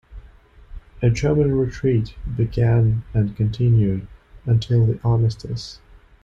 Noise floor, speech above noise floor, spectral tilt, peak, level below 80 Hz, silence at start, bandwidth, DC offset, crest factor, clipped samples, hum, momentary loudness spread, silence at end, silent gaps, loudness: -47 dBFS; 28 dB; -8.5 dB/octave; -8 dBFS; -38 dBFS; 0.1 s; 7.4 kHz; under 0.1%; 12 dB; under 0.1%; none; 12 LU; 0.5 s; none; -20 LUFS